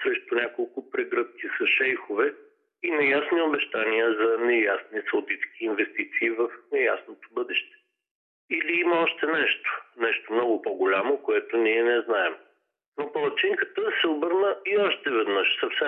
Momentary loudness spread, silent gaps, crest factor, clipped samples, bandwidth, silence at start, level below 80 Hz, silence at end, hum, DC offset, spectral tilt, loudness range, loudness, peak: 8 LU; 8.11-8.48 s, 12.86-12.92 s; 14 dB; under 0.1%; 4.1 kHz; 0 s; -84 dBFS; 0 s; none; under 0.1%; -6.5 dB/octave; 3 LU; -25 LUFS; -12 dBFS